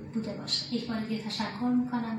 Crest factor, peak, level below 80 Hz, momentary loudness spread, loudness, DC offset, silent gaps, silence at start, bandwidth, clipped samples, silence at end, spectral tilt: 14 dB; -16 dBFS; -66 dBFS; 5 LU; -31 LUFS; under 0.1%; none; 0 s; 12 kHz; under 0.1%; 0 s; -4.5 dB/octave